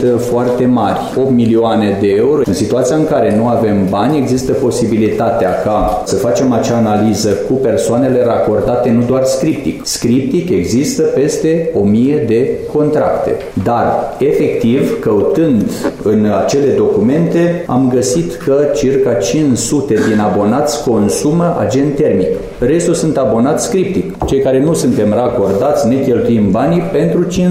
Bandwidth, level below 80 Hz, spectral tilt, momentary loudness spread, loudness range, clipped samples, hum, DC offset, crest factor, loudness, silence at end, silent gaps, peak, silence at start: 16 kHz; -36 dBFS; -6 dB/octave; 3 LU; 1 LU; under 0.1%; none; 0.2%; 8 dB; -12 LUFS; 0 s; none; -4 dBFS; 0 s